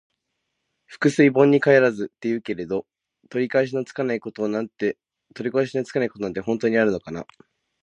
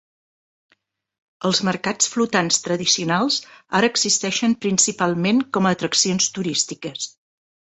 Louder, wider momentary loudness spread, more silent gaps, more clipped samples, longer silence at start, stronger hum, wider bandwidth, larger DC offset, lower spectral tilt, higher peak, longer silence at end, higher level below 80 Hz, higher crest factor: second, -22 LUFS vs -19 LUFS; first, 13 LU vs 7 LU; neither; neither; second, 0.9 s vs 1.4 s; neither; first, 10.5 kHz vs 8.4 kHz; neither; first, -6.5 dB/octave vs -2.5 dB/octave; about the same, -2 dBFS vs -2 dBFS; about the same, 0.6 s vs 0.65 s; about the same, -64 dBFS vs -62 dBFS; about the same, 20 dB vs 20 dB